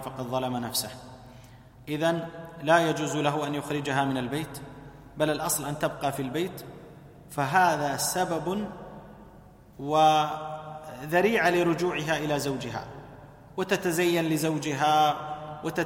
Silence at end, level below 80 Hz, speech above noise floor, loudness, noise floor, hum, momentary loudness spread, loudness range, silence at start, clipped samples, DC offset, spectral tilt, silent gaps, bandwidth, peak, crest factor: 0 s; -58 dBFS; 25 dB; -27 LUFS; -51 dBFS; none; 20 LU; 4 LU; 0 s; under 0.1%; under 0.1%; -4.5 dB/octave; none; 16.5 kHz; -8 dBFS; 20 dB